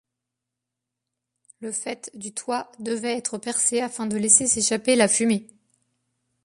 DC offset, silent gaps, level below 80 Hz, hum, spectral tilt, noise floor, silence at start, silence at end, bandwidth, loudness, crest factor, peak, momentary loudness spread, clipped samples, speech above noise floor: under 0.1%; none; -64 dBFS; none; -2.5 dB/octave; -85 dBFS; 1.6 s; 1 s; 11.5 kHz; -22 LUFS; 24 dB; -2 dBFS; 16 LU; under 0.1%; 61 dB